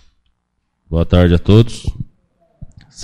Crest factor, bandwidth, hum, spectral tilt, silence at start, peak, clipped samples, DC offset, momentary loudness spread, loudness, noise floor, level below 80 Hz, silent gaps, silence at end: 16 dB; 10.5 kHz; none; -7.5 dB/octave; 0.9 s; 0 dBFS; under 0.1%; under 0.1%; 19 LU; -14 LUFS; -68 dBFS; -28 dBFS; none; 0 s